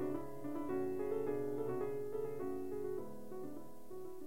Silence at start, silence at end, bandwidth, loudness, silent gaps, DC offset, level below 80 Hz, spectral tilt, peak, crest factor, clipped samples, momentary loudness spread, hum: 0 s; 0 s; 16 kHz; -42 LUFS; none; 0.5%; -70 dBFS; -8 dB/octave; -28 dBFS; 14 dB; under 0.1%; 11 LU; none